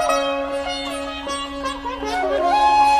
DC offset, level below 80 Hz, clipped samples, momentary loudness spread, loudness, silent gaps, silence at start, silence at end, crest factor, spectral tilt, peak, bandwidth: under 0.1%; -42 dBFS; under 0.1%; 11 LU; -21 LUFS; none; 0 s; 0 s; 14 dB; -2.5 dB/octave; -6 dBFS; 15 kHz